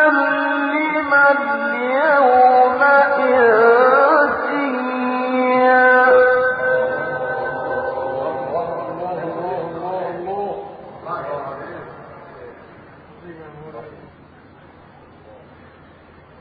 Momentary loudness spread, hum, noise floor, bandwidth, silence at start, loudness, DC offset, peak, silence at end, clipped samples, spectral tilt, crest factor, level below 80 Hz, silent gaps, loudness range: 20 LU; none; -45 dBFS; 5 kHz; 0 s; -16 LUFS; under 0.1%; -2 dBFS; 1.1 s; under 0.1%; -9 dB/octave; 16 dB; -60 dBFS; none; 18 LU